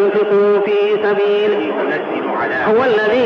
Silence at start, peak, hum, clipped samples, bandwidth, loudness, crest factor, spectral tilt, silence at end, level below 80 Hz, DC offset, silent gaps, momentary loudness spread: 0 s; -6 dBFS; none; under 0.1%; 5.8 kHz; -15 LUFS; 8 dB; -6.5 dB/octave; 0 s; -58 dBFS; under 0.1%; none; 6 LU